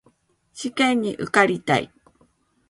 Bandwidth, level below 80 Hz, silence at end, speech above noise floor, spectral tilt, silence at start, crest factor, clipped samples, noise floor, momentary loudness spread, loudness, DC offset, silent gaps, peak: 11.5 kHz; -62 dBFS; 0.85 s; 41 dB; -4.5 dB/octave; 0.55 s; 24 dB; under 0.1%; -62 dBFS; 13 LU; -21 LUFS; under 0.1%; none; 0 dBFS